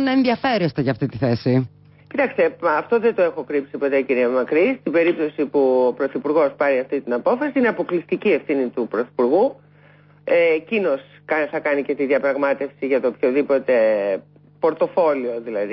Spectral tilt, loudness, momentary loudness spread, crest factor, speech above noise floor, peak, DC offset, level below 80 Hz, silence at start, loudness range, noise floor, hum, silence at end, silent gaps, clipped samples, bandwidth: -11 dB/octave; -20 LUFS; 6 LU; 12 dB; 31 dB; -8 dBFS; under 0.1%; -60 dBFS; 0 s; 2 LU; -50 dBFS; 50 Hz at -50 dBFS; 0 s; none; under 0.1%; 5.8 kHz